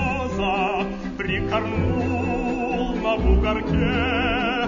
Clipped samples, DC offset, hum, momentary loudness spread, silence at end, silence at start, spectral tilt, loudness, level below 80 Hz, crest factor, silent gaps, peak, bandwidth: under 0.1%; under 0.1%; none; 5 LU; 0 s; 0 s; -7 dB/octave; -23 LUFS; -30 dBFS; 14 dB; none; -8 dBFS; 7.4 kHz